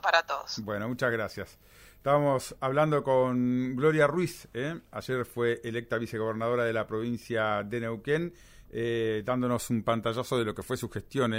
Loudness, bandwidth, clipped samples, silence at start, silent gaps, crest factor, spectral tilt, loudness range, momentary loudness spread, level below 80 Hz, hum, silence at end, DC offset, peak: -30 LUFS; 16 kHz; under 0.1%; 0.05 s; none; 22 dB; -6 dB/octave; 4 LU; 9 LU; -58 dBFS; none; 0 s; under 0.1%; -6 dBFS